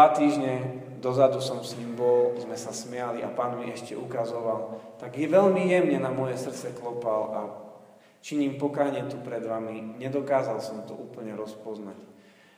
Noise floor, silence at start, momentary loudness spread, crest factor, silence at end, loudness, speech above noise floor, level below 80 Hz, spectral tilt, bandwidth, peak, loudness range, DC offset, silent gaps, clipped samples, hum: -53 dBFS; 0 s; 16 LU; 22 dB; 0.45 s; -28 LUFS; 25 dB; -78 dBFS; -6 dB/octave; 15.5 kHz; -4 dBFS; 5 LU; under 0.1%; none; under 0.1%; none